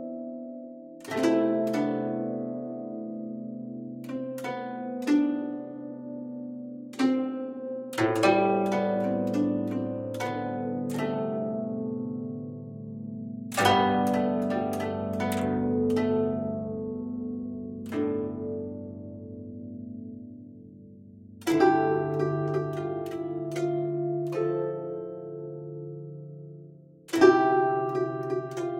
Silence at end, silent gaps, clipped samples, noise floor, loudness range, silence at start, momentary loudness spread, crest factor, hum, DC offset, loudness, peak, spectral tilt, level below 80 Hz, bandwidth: 0 s; none; under 0.1%; -50 dBFS; 7 LU; 0 s; 17 LU; 22 dB; none; under 0.1%; -29 LUFS; -6 dBFS; -6.5 dB/octave; -68 dBFS; 16.5 kHz